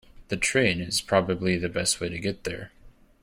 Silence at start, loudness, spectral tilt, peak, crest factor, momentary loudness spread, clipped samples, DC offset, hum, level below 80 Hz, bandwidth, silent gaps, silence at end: 0.15 s; -26 LUFS; -3.5 dB/octave; -6 dBFS; 22 dB; 12 LU; under 0.1%; under 0.1%; none; -52 dBFS; 16.5 kHz; none; 0.3 s